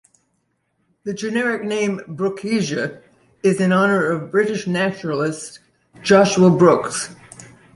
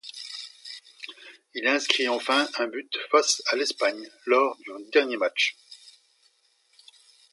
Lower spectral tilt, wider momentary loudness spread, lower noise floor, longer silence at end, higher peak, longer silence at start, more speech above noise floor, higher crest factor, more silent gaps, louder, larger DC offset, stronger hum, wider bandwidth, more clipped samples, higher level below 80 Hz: first, -5.5 dB/octave vs 0.5 dB/octave; second, 14 LU vs 19 LU; about the same, -69 dBFS vs -66 dBFS; second, 0.3 s vs 1.4 s; about the same, -2 dBFS vs -2 dBFS; first, 1.05 s vs 0.05 s; first, 51 dB vs 41 dB; second, 18 dB vs 26 dB; neither; first, -18 LUFS vs -24 LUFS; neither; neither; about the same, 11.5 kHz vs 11.5 kHz; neither; first, -60 dBFS vs -86 dBFS